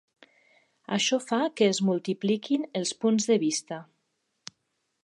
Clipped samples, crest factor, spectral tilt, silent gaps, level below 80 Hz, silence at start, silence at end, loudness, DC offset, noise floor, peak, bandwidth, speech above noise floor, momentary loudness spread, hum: under 0.1%; 18 dB; -4 dB/octave; none; -80 dBFS; 0.9 s; 1.2 s; -26 LUFS; under 0.1%; -78 dBFS; -10 dBFS; 11.5 kHz; 52 dB; 20 LU; none